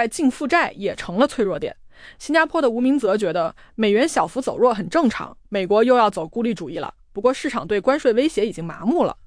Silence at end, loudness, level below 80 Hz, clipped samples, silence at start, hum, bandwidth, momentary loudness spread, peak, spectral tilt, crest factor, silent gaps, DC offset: 0.15 s; -20 LUFS; -50 dBFS; under 0.1%; 0 s; none; 10.5 kHz; 10 LU; -6 dBFS; -5 dB/octave; 14 dB; none; under 0.1%